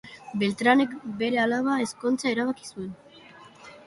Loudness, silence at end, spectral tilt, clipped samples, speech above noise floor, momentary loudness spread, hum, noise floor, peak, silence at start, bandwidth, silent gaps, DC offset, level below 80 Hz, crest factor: -25 LUFS; 0.1 s; -4.5 dB/octave; under 0.1%; 24 dB; 16 LU; none; -50 dBFS; -8 dBFS; 0.05 s; 11.5 kHz; none; under 0.1%; -66 dBFS; 18 dB